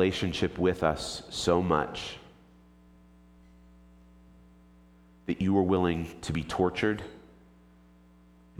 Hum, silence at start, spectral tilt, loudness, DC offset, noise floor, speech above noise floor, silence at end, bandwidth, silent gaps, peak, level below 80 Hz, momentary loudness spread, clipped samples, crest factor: 60 Hz at -55 dBFS; 0 s; -5.5 dB/octave; -29 LUFS; under 0.1%; -57 dBFS; 29 dB; 1.4 s; 14.5 kHz; none; -10 dBFS; -52 dBFS; 12 LU; under 0.1%; 22 dB